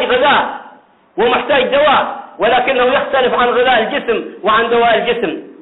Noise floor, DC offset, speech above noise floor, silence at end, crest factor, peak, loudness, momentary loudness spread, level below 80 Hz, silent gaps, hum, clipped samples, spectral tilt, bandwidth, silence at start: -42 dBFS; 0.1%; 29 dB; 0.1 s; 10 dB; -2 dBFS; -13 LUFS; 8 LU; -48 dBFS; none; none; under 0.1%; -7.5 dB/octave; 4.1 kHz; 0 s